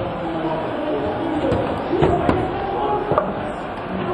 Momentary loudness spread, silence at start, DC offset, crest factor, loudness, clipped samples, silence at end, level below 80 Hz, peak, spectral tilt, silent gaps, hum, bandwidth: 8 LU; 0 s; under 0.1%; 20 dB; -22 LUFS; under 0.1%; 0 s; -38 dBFS; -2 dBFS; -8 dB/octave; none; none; 10 kHz